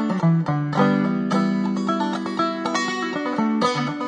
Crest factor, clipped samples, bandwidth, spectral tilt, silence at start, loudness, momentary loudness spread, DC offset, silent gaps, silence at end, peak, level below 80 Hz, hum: 18 dB; under 0.1%; 10 kHz; -6.5 dB/octave; 0 s; -22 LUFS; 4 LU; under 0.1%; none; 0 s; -4 dBFS; -66 dBFS; none